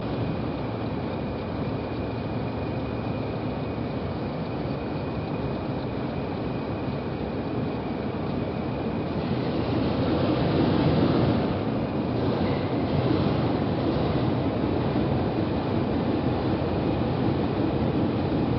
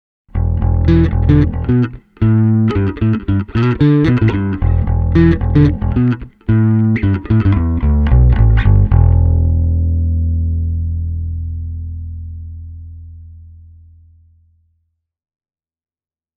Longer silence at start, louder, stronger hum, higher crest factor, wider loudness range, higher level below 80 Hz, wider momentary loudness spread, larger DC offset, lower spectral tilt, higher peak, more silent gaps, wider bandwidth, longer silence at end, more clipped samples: second, 0 s vs 0.35 s; second, -27 LUFS vs -14 LUFS; neither; about the same, 16 dB vs 14 dB; second, 6 LU vs 13 LU; second, -42 dBFS vs -20 dBFS; second, 6 LU vs 14 LU; neither; second, -7 dB/octave vs -10.5 dB/octave; second, -10 dBFS vs 0 dBFS; neither; first, 5.8 kHz vs 4.8 kHz; second, 0 s vs 2.9 s; neither